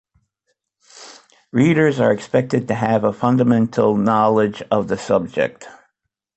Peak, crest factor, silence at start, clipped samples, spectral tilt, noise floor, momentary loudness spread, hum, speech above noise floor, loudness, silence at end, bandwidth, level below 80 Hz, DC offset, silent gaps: -2 dBFS; 16 dB; 0.95 s; under 0.1%; -7.5 dB/octave; -74 dBFS; 6 LU; none; 57 dB; -18 LUFS; 0.65 s; 8.4 kHz; -54 dBFS; under 0.1%; none